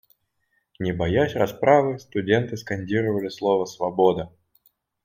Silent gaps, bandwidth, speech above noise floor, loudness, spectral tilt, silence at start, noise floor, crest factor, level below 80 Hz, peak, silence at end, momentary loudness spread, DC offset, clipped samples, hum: none; 16 kHz; 49 dB; -23 LUFS; -6.5 dB/octave; 0.8 s; -72 dBFS; 20 dB; -54 dBFS; -4 dBFS; 0.75 s; 11 LU; under 0.1%; under 0.1%; none